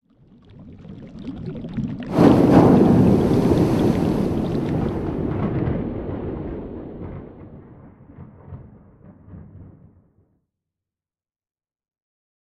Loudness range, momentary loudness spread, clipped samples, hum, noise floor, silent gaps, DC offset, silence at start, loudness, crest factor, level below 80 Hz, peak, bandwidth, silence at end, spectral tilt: 20 LU; 26 LU; under 0.1%; none; under -90 dBFS; none; under 0.1%; 0.6 s; -19 LUFS; 20 dB; -40 dBFS; -2 dBFS; 13.5 kHz; 2.85 s; -9 dB/octave